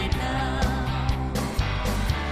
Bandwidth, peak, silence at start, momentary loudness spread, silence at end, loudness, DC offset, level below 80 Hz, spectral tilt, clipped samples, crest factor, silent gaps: 15.5 kHz; -12 dBFS; 0 s; 2 LU; 0 s; -26 LUFS; under 0.1%; -30 dBFS; -5.5 dB/octave; under 0.1%; 14 dB; none